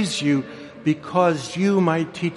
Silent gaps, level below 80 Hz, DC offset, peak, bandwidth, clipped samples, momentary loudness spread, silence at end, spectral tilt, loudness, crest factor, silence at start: none; -62 dBFS; under 0.1%; -6 dBFS; 11.5 kHz; under 0.1%; 6 LU; 0 s; -5.5 dB/octave; -21 LUFS; 16 dB; 0 s